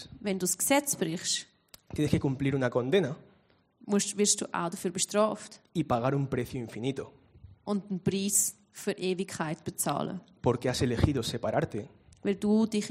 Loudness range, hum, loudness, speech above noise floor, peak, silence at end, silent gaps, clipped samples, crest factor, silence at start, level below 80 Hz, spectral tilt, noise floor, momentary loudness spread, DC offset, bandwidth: 3 LU; none; -30 LUFS; 36 dB; -8 dBFS; 0 s; none; under 0.1%; 22 dB; 0 s; -54 dBFS; -4.5 dB/octave; -66 dBFS; 11 LU; under 0.1%; 16 kHz